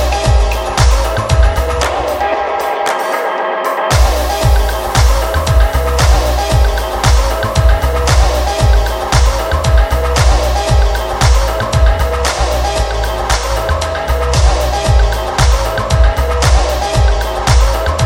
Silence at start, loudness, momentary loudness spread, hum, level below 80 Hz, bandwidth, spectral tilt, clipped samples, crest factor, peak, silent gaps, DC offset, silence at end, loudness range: 0 s; -13 LUFS; 4 LU; none; -14 dBFS; 16.5 kHz; -4.5 dB/octave; under 0.1%; 12 dB; 0 dBFS; none; 0.5%; 0 s; 2 LU